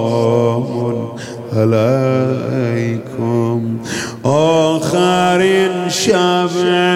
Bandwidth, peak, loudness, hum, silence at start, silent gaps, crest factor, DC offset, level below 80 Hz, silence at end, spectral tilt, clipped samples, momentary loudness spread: 15.5 kHz; -2 dBFS; -15 LUFS; none; 0 s; none; 12 dB; under 0.1%; -56 dBFS; 0 s; -5.5 dB/octave; under 0.1%; 8 LU